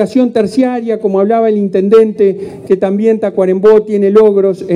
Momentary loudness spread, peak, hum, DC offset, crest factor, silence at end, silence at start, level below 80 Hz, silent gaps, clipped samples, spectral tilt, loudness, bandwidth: 6 LU; 0 dBFS; none; under 0.1%; 10 dB; 0 s; 0 s; -54 dBFS; none; 0.5%; -8 dB/octave; -10 LUFS; 10.5 kHz